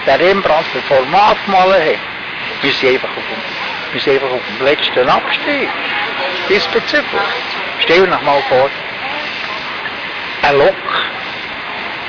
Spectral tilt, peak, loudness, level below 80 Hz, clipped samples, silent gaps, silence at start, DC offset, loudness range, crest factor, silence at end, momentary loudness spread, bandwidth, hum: -4.5 dB/octave; -4 dBFS; -14 LUFS; -46 dBFS; under 0.1%; none; 0 s; under 0.1%; 2 LU; 12 dB; 0 s; 10 LU; 5.4 kHz; none